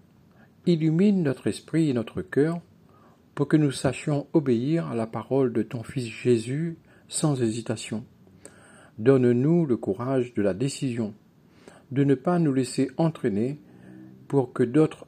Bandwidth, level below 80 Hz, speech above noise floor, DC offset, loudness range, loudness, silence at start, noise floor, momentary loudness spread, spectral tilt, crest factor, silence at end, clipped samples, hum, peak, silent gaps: 13.5 kHz; -68 dBFS; 32 dB; under 0.1%; 2 LU; -25 LUFS; 0.65 s; -56 dBFS; 10 LU; -7 dB/octave; 18 dB; 0.05 s; under 0.1%; none; -6 dBFS; none